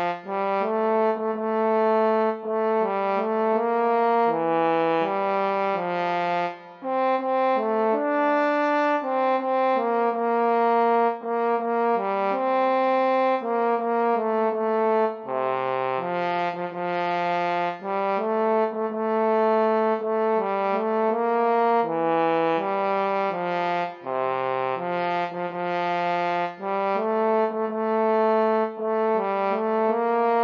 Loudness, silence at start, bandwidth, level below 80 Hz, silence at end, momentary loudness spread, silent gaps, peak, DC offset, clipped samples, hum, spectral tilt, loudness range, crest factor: -23 LUFS; 0 s; 6.4 kHz; -88 dBFS; 0 s; 5 LU; none; -10 dBFS; under 0.1%; under 0.1%; none; -7.5 dB/octave; 3 LU; 14 dB